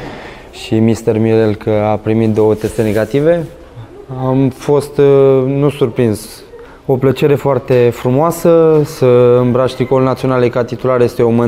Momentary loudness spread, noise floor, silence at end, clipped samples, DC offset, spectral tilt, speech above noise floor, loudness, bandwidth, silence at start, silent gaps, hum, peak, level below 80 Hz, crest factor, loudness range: 9 LU; -35 dBFS; 0 s; under 0.1%; under 0.1%; -7.5 dB/octave; 23 dB; -12 LUFS; 16 kHz; 0 s; none; none; 0 dBFS; -40 dBFS; 12 dB; 3 LU